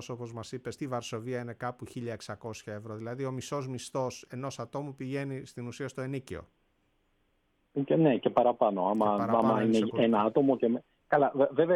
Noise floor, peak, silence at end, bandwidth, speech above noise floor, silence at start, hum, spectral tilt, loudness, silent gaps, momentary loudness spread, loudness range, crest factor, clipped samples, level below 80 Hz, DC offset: -73 dBFS; -12 dBFS; 0 s; 13 kHz; 43 dB; 0 s; none; -6.5 dB/octave; -30 LUFS; none; 14 LU; 12 LU; 18 dB; under 0.1%; -68 dBFS; under 0.1%